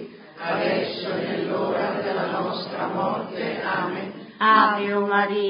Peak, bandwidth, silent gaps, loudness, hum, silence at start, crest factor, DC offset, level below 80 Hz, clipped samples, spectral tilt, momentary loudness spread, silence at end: -4 dBFS; 5.4 kHz; none; -24 LUFS; none; 0 s; 20 dB; under 0.1%; -72 dBFS; under 0.1%; -9.5 dB/octave; 11 LU; 0 s